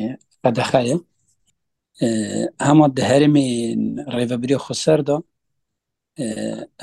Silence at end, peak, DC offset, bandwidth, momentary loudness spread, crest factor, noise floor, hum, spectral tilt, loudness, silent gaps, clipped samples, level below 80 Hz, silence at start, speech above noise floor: 0 s; 0 dBFS; under 0.1%; 12 kHz; 11 LU; 20 dB; -81 dBFS; none; -6 dB/octave; -19 LUFS; none; under 0.1%; -58 dBFS; 0 s; 63 dB